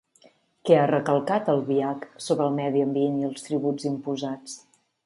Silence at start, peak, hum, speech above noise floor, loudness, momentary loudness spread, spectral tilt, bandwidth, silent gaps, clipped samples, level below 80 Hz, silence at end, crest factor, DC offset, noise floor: 0.65 s; -6 dBFS; none; 35 dB; -25 LUFS; 13 LU; -6.5 dB/octave; 11.5 kHz; none; under 0.1%; -74 dBFS; 0.45 s; 20 dB; under 0.1%; -59 dBFS